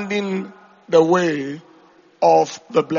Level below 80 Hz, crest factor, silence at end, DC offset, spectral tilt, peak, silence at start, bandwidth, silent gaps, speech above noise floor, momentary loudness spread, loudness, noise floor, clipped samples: -64 dBFS; 16 dB; 0 s; under 0.1%; -4.5 dB/octave; -2 dBFS; 0 s; 7.2 kHz; none; 33 dB; 15 LU; -18 LUFS; -51 dBFS; under 0.1%